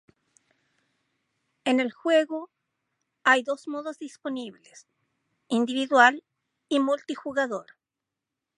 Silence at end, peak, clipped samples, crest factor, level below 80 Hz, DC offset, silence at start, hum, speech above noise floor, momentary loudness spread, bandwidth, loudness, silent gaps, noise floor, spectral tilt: 0.95 s; -4 dBFS; under 0.1%; 24 dB; -82 dBFS; under 0.1%; 1.65 s; none; 62 dB; 17 LU; 11 kHz; -25 LUFS; none; -87 dBFS; -3 dB/octave